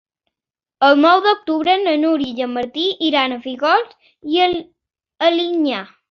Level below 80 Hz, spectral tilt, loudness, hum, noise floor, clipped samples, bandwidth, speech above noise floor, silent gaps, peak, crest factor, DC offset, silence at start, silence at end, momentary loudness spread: -60 dBFS; -4.5 dB/octave; -17 LUFS; none; -88 dBFS; under 0.1%; 6.8 kHz; 71 dB; none; -2 dBFS; 16 dB; under 0.1%; 0.8 s; 0.25 s; 10 LU